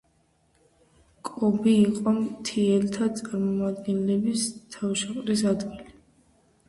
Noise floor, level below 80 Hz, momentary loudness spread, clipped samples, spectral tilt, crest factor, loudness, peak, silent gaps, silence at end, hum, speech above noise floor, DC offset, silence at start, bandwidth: -66 dBFS; -60 dBFS; 10 LU; under 0.1%; -5.5 dB/octave; 16 dB; -25 LUFS; -10 dBFS; none; 0.75 s; none; 41 dB; under 0.1%; 1.25 s; 11.5 kHz